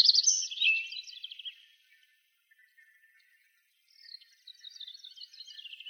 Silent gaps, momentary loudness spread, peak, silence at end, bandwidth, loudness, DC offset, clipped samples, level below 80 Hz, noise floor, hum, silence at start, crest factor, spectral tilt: none; 24 LU; -10 dBFS; 0 s; 19.5 kHz; -27 LUFS; under 0.1%; under 0.1%; under -90 dBFS; -71 dBFS; none; 0 s; 24 dB; 13 dB/octave